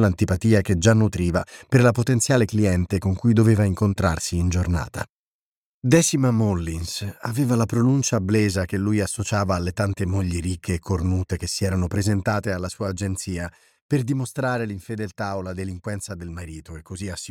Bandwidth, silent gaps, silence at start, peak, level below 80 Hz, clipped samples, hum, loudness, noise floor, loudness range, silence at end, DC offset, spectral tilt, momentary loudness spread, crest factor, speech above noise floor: 16 kHz; 5.10-5.82 s, 13.81-13.89 s; 0 s; -4 dBFS; -42 dBFS; under 0.1%; none; -22 LUFS; under -90 dBFS; 7 LU; 0 s; under 0.1%; -6 dB/octave; 13 LU; 18 dB; over 68 dB